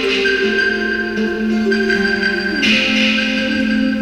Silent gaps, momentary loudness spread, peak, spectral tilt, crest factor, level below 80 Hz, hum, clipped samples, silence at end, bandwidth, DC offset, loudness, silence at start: none; 5 LU; -4 dBFS; -4 dB/octave; 12 dB; -42 dBFS; none; under 0.1%; 0 s; 11 kHz; under 0.1%; -15 LUFS; 0 s